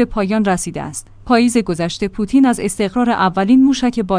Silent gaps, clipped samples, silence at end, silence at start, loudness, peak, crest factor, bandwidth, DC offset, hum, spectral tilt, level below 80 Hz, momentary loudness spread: none; under 0.1%; 0 s; 0 s; -15 LUFS; 0 dBFS; 14 dB; 10.5 kHz; under 0.1%; none; -5 dB/octave; -38 dBFS; 10 LU